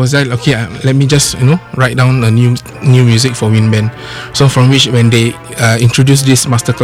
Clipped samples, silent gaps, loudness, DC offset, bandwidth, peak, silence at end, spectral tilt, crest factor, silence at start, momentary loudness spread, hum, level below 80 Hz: under 0.1%; none; -10 LUFS; under 0.1%; 15.5 kHz; 0 dBFS; 0 s; -5 dB/octave; 10 dB; 0 s; 6 LU; none; -38 dBFS